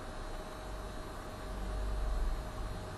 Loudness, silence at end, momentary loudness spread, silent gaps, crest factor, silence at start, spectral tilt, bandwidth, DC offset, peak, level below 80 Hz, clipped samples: -42 LUFS; 0 s; 6 LU; none; 14 dB; 0 s; -5.5 dB/octave; 12.5 kHz; under 0.1%; -26 dBFS; -40 dBFS; under 0.1%